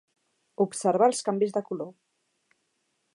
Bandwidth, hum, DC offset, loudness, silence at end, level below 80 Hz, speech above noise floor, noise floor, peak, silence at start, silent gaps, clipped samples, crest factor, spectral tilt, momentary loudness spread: 11.5 kHz; none; under 0.1%; -26 LUFS; 1.25 s; -86 dBFS; 50 dB; -75 dBFS; -8 dBFS; 0.6 s; none; under 0.1%; 20 dB; -5 dB/octave; 13 LU